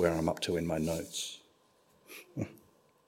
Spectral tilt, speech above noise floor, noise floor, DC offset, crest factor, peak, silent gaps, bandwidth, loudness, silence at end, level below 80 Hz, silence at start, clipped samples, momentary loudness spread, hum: -5 dB/octave; 34 dB; -68 dBFS; under 0.1%; 22 dB; -14 dBFS; none; 16 kHz; -35 LUFS; 0.5 s; -58 dBFS; 0 s; under 0.1%; 18 LU; none